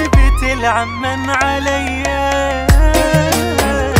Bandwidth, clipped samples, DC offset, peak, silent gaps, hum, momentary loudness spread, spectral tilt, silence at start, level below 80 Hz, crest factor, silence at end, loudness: 16.5 kHz; under 0.1%; under 0.1%; 0 dBFS; none; none; 5 LU; -5 dB/octave; 0 s; -18 dBFS; 12 dB; 0 s; -14 LUFS